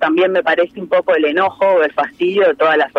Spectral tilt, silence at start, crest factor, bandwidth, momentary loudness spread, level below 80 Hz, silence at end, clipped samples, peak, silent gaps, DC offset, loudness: -6 dB/octave; 0 s; 12 dB; 6.2 kHz; 4 LU; -60 dBFS; 0 s; under 0.1%; -2 dBFS; none; under 0.1%; -14 LUFS